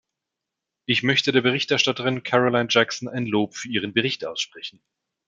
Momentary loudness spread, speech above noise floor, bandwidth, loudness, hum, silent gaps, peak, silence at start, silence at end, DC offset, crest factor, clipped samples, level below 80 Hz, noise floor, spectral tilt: 10 LU; 62 dB; 7.8 kHz; -22 LUFS; none; none; -2 dBFS; 0.9 s; 0.6 s; under 0.1%; 22 dB; under 0.1%; -68 dBFS; -85 dBFS; -4 dB/octave